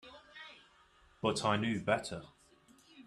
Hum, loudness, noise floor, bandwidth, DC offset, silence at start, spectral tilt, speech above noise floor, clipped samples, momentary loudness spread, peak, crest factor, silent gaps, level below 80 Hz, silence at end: none; -34 LUFS; -65 dBFS; 12.5 kHz; under 0.1%; 0.05 s; -5 dB/octave; 32 dB; under 0.1%; 19 LU; -14 dBFS; 24 dB; none; -68 dBFS; 0.05 s